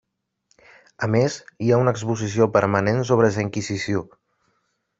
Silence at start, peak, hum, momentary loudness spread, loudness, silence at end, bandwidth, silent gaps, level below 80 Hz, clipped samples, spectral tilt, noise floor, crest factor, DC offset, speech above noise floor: 1 s; -2 dBFS; none; 8 LU; -21 LUFS; 0.95 s; 8 kHz; none; -58 dBFS; under 0.1%; -6.5 dB/octave; -71 dBFS; 20 dB; under 0.1%; 50 dB